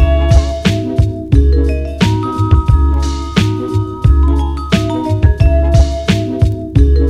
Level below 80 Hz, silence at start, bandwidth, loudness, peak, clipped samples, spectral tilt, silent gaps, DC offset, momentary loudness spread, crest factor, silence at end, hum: -14 dBFS; 0 s; 9.8 kHz; -13 LUFS; 0 dBFS; under 0.1%; -7 dB/octave; none; under 0.1%; 5 LU; 10 dB; 0 s; none